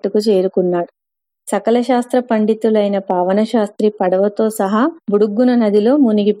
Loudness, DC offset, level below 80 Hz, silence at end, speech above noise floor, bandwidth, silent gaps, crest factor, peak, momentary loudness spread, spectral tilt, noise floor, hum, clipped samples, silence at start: -15 LUFS; under 0.1%; -70 dBFS; 0 s; 70 dB; 14.5 kHz; none; 12 dB; -2 dBFS; 5 LU; -6.5 dB/octave; -84 dBFS; none; under 0.1%; 0.05 s